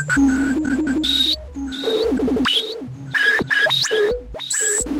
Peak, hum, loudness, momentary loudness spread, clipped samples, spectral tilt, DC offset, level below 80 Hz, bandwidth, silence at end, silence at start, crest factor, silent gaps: -6 dBFS; none; -18 LUFS; 8 LU; under 0.1%; -2.5 dB/octave; under 0.1%; -40 dBFS; 16 kHz; 0 s; 0 s; 14 dB; none